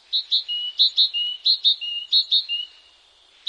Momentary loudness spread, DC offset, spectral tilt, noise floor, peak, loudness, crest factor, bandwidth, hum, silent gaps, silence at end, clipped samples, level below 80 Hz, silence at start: 10 LU; under 0.1%; 4 dB/octave; -55 dBFS; -6 dBFS; -19 LUFS; 16 dB; 9.4 kHz; none; none; 0.85 s; under 0.1%; -76 dBFS; 0.1 s